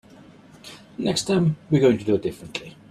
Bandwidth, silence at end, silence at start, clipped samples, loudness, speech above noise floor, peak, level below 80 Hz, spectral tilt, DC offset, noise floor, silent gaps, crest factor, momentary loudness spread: 13 kHz; 0.2 s; 0.65 s; under 0.1%; -22 LUFS; 26 dB; -6 dBFS; -56 dBFS; -6 dB/octave; under 0.1%; -48 dBFS; none; 18 dB; 20 LU